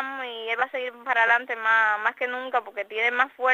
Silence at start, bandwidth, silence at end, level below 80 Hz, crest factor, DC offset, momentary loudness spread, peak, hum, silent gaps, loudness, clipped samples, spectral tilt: 0 s; 15.5 kHz; 0 s; under -90 dBFS; 18 dB; under 0.1%; 11 LU; -6 dBFS; none; none; -24 LUFS; under 0.1%; -1.5 dB/octave